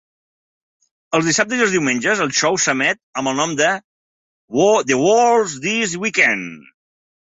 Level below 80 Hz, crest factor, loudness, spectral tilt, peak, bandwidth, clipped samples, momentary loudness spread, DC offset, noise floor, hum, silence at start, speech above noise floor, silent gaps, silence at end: -62 dBFS; 16 dB; -17 LUFS; -3 dB/octave; -2 dBFS; 8.2 kHz; under 0.1%; 8 LU; under 0.1%; under -90 dBFS; none; 1.1 s; over 73 dB; 3.03-3.13 s, 3.84-4.48 s; 0.65 s